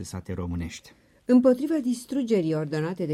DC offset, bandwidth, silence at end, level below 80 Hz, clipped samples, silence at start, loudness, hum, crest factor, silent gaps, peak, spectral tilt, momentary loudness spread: under 0.1%; 13.5 kHz; 0 s; -52 dBFS; under 0.1%; 0 s; -25 LUFS; none; 16 dB; none; -10 dBFS; -7 dB/octave; 16 LU